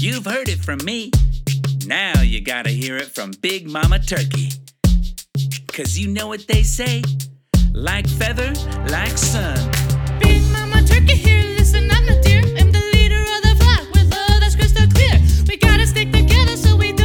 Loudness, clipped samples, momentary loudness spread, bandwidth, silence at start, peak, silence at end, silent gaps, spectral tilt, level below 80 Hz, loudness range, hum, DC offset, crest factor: -16 LUFS; under 0.1%; 10 LU; 18 kHz; 0 s; 0 dBFS; 0 s; none; -5 dB/octave; -18 dBFS; 7 LU; none; under 0.1%; 14 dB